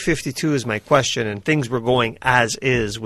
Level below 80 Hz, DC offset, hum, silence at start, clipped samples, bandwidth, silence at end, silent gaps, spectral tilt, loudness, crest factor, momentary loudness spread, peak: -44 dBFS; under 0.1%; none; 0 s; under 0.1%; 13 kHz; 0 s; none; -4.5 dB/octave; -19 LUFS; 20 dB; 5 LU; 0 dBFS